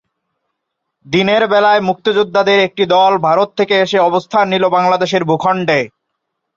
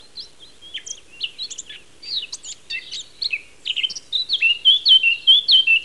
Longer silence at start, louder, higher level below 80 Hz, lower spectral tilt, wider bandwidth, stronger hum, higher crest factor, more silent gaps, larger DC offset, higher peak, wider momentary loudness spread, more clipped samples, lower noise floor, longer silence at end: first, 1.1 s vs 0.15 s; about the same, -13 LUFS vs -15 LUFS; about the same, -58 dBFS vs -62 dBFS; first, -5.5 dB/octave vs 3 dB/octave; second, 7.6 kHz vs 11.5 kHz; neither; about the same, 12 dB vs 16 dB; neither; second, under 0.1% vs 0.5%; about the same, -2 dBFS vs -4 dBFS; second, 4 LU vs 22 LU; neither; first, -75 dBFS vs -45 dBFS; first, 0.7 s vs 0 s